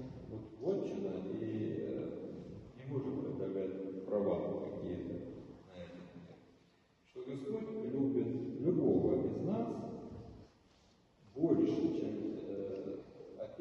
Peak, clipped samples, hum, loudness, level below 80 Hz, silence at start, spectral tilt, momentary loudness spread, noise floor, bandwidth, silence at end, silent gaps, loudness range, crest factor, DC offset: -20 dBFS; under 0.1%; none; -38 LUFS; -68 dBFS; 0 s; -9.5 dB/octave; 20 LU; -69 dBFS; 7 kHz; 0 s; none; 6 LU; 20 dB; under 0.1%